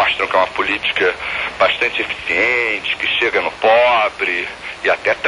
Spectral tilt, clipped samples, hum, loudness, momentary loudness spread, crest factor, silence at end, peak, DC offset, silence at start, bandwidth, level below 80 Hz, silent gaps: -3 dB/octave; under 0.1%; none; -16 LUFS; 7 LU; 14 dB; 0 s; -2 dBFS; under 0.1%; 0 s; 11.5 kHz; -48 dBFS; none